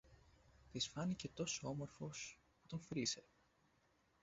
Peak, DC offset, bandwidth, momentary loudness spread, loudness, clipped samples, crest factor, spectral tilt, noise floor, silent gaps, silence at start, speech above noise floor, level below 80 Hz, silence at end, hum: -28 dBFS; under 0.1%; 8 kHz; 10 LU; -46 LUFS; under 0.1%; 22 dB; -4.5 dB/octave; -78 dBFS; none; 0.05 s; 32 dB; -72 dBFS; 1 s; none